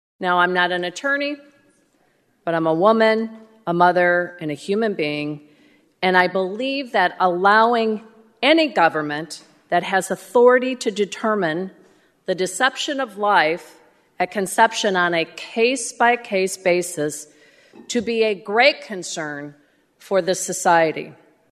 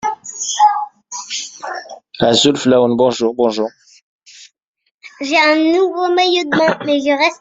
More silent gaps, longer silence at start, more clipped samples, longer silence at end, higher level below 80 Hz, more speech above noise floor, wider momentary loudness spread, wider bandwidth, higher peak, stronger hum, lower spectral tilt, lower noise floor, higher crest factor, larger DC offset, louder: second, none vs 4.03-4.19 s, 4.63-4.74 s, 4.91-4.99 s; first, 0.2 s vs 0.05 s; neither; first, 0.4 s vs 0.05 s; second, -70 dBFS vs -58 dBFS; first, 43 dB vs 30 dB; about the same, 13 LU vs 15 LU; first, 13.5 kHz vs 8.2 kHz; about the same, 0 dBFS vs -2 dBFS; neither; about the same, -3.5 dB/octave vs -3.5 dB/octave; first, -62 dBFS vs -43 dBFS; first, 20 dB vs 14 dB; neither; second, -19 LUFS vs -14 LUFS